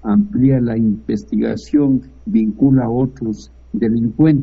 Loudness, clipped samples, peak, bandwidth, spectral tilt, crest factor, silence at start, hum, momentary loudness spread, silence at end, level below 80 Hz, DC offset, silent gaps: -17 LUFS; under 0.1%; -2 dBFS; 7.4 kHz; -10 dB/octave; 14 dB; 0.05 s; none; 8 LU; 0 s; -40 dBFS; under 0.1%; none